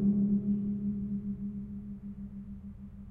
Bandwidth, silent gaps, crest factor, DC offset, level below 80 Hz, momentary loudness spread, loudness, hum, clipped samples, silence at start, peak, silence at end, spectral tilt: 1.5 kHz; none; 14 dB; under 0.1%; -52 dBFS; 17 LU; -34 LUFS; none; under 0.1%; 0 s; -18 dBFS; 0 s; -13 dB/octave